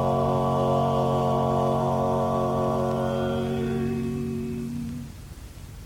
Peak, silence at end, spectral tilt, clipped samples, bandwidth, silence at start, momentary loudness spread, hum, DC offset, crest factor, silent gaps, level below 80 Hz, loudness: -12 dBFS; 0 s; -8 dB/octave; under 0.1%; 16.5 kHz; 0 s; 14 LU; none; under 0.1%; 12 dB; none; -44 dBFS; -25 LUFS